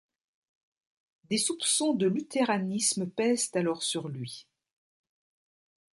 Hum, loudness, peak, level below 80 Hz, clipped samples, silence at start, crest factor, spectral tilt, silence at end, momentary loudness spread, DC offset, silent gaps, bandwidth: none; -28 LUFS; -14 dBFS; -78 dBFS; under 0.1%; 1.3 s; 18 dB; -3.5 dB/octave; 1.5 s; 11 LU; under 0.1%; none; 12 kHz